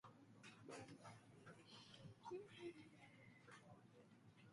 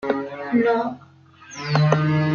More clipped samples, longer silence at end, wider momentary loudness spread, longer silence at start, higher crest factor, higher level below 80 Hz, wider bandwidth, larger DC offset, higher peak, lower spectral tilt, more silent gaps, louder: neither; about the same, 0 s vs 0 s; second, 11 LU vs 16 LU; about the same, 0.05 s vs 0 s; about the same, 18 dB vs 18 dB; second, -90 dBFS vs -58 dBFS; first, 11.5 kHz vs 7 kHz; neither; second, -44 dBFS vs -4 dBFS; second, -5 dB/octave vs -7.5 dB/octave; neither; second, -62 LUFS vs -21 LUFS